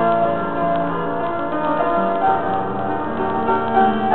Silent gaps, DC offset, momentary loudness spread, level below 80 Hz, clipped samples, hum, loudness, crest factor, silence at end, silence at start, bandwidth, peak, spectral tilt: none; 3%; 6 LU; -46 dBFS; under 0.1%; none; -20 LUFS; 14 dB; 0 s; 0 s; 4.3 kHz; -4 dBFS; -10 dB/octave